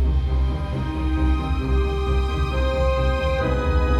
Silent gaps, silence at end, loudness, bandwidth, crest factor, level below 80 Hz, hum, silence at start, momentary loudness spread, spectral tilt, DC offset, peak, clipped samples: none; 0 s; -23 LUFS; 8 kHz; 12 dB; -22 dBFS; none; 0 s; 3 LU; -7.5 dB/octave; under 0.1%; -8 dBFS; under 0.1%